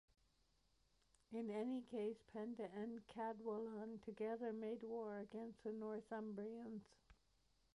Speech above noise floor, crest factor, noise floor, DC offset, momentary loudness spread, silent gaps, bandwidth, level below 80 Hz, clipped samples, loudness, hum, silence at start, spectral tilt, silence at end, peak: 32 dB; 14 dB; -81 dBFS; under 0.1%; 6 LU; none; 11 kHz; -82 dBFS; under 0.1%; -50 LUFS; none; 1.3 s; -7.5 dB/octave; 0.6 s; -36 dBFS